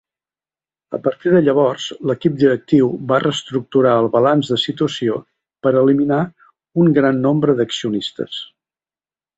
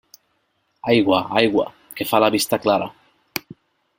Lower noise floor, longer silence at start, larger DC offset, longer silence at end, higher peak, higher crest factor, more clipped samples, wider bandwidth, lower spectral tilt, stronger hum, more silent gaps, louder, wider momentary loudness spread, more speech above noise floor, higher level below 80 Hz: first, under -90 dBFS vs -68 dBFS; about the same, 0.9 s vs 0.85 s; neither; first, 0.9 s vs 0.6 s; about the same, -2 dBFS vs 0 dBFS; second, 16 dB vs 22 dB; neither; second, 8.2 kHz vs 16.5 kHz; first, -6.5 dB/octave vs -4.5 dB/octave; neither; neither; first, -17 LUFS vs -20 LUFS; second, 11 LU vs 14 LU; first, over 74 dB vs 50 dB; about the same, -60 dBFS vs -58 dBFS